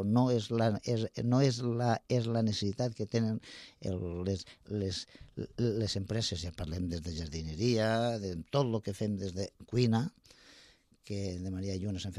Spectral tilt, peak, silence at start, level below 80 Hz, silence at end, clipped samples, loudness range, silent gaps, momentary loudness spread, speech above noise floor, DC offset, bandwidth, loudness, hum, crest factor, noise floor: -6.5 dB/octave; -16 dBFS; 0 s; -56 dBFS; 0 s; under 0.1%; 5 LU; none; 10 LU; 29 dB; under 0.1%; 11.5 kHz; -34 LUFS; none; 18 dB; -62 dBFS